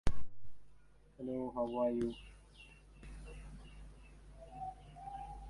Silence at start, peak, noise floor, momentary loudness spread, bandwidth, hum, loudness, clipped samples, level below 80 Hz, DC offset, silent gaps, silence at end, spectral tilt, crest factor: 0.05 s; -18 dBFS; -63 dBFS; 22 LU; 11.5 kHz; none; -42 LUFS; under 0.1%; -50 dBFS; under 0.1%; none; 0 s; -7 dB/octave; 20 dB